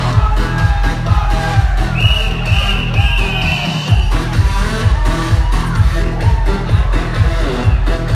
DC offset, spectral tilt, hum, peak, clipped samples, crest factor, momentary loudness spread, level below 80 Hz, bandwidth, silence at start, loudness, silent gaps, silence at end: under 0.1%; -5.5 dB/octave; none; 0 dBFS; under 0.1%; 12 dB; 2 LU; -16 dBFS; 12.5 kHz; 0 s; -15 LUFS; none; 0 s